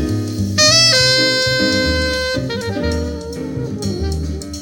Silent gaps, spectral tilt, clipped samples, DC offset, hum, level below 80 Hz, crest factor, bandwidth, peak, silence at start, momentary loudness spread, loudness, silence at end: none; -3 dB/octave; under 0.1%; under 0.1%; none; -30 dBFS; 16 dB; 18 kHz; 0 dBFS; 0 s; 15 LU; -15 LUFS; 0 s